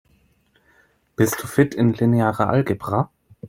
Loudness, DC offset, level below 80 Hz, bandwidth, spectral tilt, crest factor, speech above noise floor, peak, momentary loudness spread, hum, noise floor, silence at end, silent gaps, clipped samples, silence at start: -20 LUFS; under 0.1%; -54 dBFS; 16.5 kHz; -7 dB/octave; 18 dB; 42 dB; -2 dBFS; 6 LU; none; -61 dBFS; 0 s; none; under 0.1%; 1.2 s